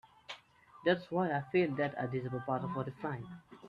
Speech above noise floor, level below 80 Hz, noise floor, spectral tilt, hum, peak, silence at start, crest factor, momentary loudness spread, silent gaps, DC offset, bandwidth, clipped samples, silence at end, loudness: 25 dB; -72 dBFS; -60 dBFS; -8 dB/octave; none; -16 dBFS; 0.3 s; 20 dB; 17 LU; none; under 0.1%; 7.2 kHz; under 0.1%; 0 s; -35 LUFS